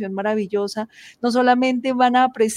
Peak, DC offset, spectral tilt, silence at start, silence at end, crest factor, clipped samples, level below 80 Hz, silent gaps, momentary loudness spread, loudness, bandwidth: -2 dBFS; under 0.1%; -4.5 dB/octave; 0 s; 0 s; 16 dB; under 0.1%; -68 dBFS; none; 10 LU; -19 LUFS; 15 kHz